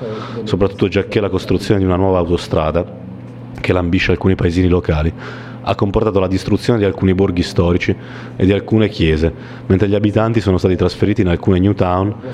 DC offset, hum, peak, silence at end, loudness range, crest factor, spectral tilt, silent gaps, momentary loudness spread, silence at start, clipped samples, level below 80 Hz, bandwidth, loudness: under 0.1%; none; -2 dBFS; 0 s; 2 LU; 14 dB; -7.5 dB/octave; none; 11 LU; 0 s; under 0.1%; -32 dBFS; 11.5 kHz; -16 LUFS